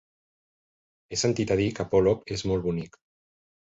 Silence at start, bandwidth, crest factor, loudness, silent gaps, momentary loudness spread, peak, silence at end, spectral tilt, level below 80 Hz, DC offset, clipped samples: 1.1 s; 8.2 kHz; 18 dB; -26 LUFS; none; 10 LU; -10 dBFS; 0.9 s; -5.5 dB/octave; -50 dBFS; under 0.1%; under 0.1%